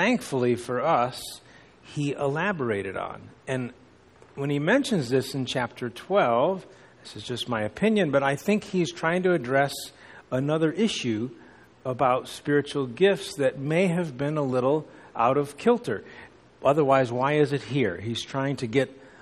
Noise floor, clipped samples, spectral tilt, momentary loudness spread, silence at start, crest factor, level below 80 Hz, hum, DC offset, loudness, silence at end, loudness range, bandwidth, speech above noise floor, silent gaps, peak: -54 dBFS; under 0.1%; -6 dB/octave; 12 LU; 0 s; 18 dB; -62 dBFS; none; under 0.1%; -26 LUFS; 0.15 s; 3 LU; 13 kHz; 29 dB; none; -8 dBFS